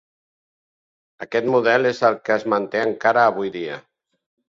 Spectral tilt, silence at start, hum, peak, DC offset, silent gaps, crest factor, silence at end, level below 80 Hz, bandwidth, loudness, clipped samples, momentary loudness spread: -5.5 dB/octave; 1.2 s; none; -2 dBFS; under 0.1%; none; 20 dB; 0.7 s; -66 dBFS; 7.6 kHz; -19 LUFS; under 0.1%; 14 LU